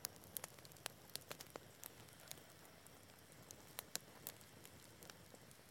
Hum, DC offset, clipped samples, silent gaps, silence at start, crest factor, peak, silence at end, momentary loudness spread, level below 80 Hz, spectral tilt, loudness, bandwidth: none; under 0.1%; under 0.1%; none; 0 s; 38 dB; -18 dBFS; 0 s; 12 LU; -80 dBFS; -2 dB/octave; -54 LUFS; 17 kHz